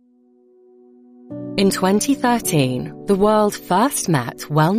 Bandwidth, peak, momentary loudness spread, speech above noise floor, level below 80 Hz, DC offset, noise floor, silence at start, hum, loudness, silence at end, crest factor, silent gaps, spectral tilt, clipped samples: 15.5 kHz; -6 dBFS; 9 LU; 37 dB; -50 dBFS; under 0.1%; -54 dBFS; 1.3 s; none; -18 LUFS; 0 s; 14 dB; none; -5 dB/octave; under 0.1%